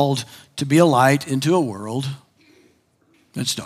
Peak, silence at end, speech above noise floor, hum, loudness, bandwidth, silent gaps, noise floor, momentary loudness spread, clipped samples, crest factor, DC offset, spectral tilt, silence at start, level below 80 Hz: -2 dBFS; 0 s; 41 dB; none; -19 LUFS; 16 kHz; none; -60 dBFS; 18 LU; under 0.1%; 20 dB; under 0.1%; -5.5 dB/octave; 0 s; -70 dBFS